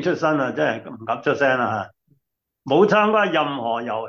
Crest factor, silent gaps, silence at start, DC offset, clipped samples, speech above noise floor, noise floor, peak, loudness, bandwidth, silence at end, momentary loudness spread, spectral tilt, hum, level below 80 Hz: 16 dB; none; 0 s; under 0.1%; under 0.1%; 53 dB; -73 dBFS; -4 dBFS; -20 LUFS; 7.2 kHz; 0 s; 12 LU; -6 dB/octave; none; -66 dBFS